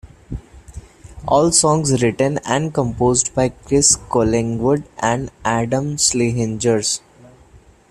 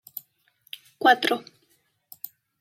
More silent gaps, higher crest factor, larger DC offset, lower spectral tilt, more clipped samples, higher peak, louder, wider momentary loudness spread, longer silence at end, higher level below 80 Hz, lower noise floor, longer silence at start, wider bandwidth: neither; about the same, 18 dB vs 22 dB; neither; first, -4 dB/octave vs -2.5 dB/octave; neither; first, 0 dBFS vs -6 dBFS; first, -17 LUFS vs -22 LUFS; second, 8 LU vs 23 LU; second, 0.35 s vs 1.2 s; first, -40 dBFS vs -78 dBFS; second, -47 dBFS vs -68 dBFS; second, 0.05 s vs 1 s; second, 14 kHz vs 16.5 kHz